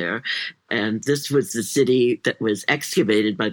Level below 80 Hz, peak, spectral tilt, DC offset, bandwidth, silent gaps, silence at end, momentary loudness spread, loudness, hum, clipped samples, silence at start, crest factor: -70 dBFS; -2 dBFS; -4.5 dB/octave; under 0.1%; 19 kHz; none; 0 s; 6 LU; -21 LUFS; none; under 0.1%; 0 s; 18 dB